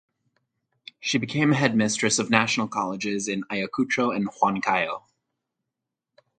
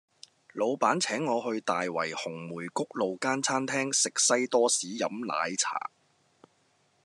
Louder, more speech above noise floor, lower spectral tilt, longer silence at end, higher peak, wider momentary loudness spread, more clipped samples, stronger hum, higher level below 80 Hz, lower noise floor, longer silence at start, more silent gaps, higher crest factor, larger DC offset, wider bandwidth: first, -24 LUFS vs -28 LUFS; first, 61 dB vs 40 dB; first, -4 dB/octave vs -2 dB/octave; first, 1.4 s vs 1.2 s; first, 0 dBFS vs -10 dBFS; second, 7 LU vs 11 LU; neither; neither; first, -66 dBFS vs -86 dBFS; first, -85 dBFS vs -69 dBFS; first, 1 s vs 0.55 s; neither; first, 26 dB vs 20 dB; neither; second, 9.4 kHz vs 12.5 kHz